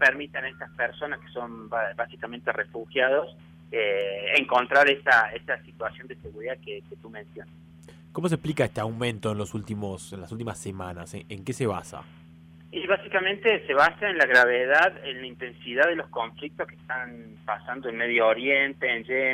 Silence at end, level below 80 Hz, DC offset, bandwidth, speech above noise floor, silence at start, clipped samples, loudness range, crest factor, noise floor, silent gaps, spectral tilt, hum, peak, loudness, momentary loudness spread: 0 s; -60 dBFS; under 0.1%; 15.5 kHz; 23 dB; 0 s; under 0.1%; 10 LU; 18 dB; -50 dBFS; none; -4.5 dB/octave; none; -8 dBFS; -25 LUFS; 18 LU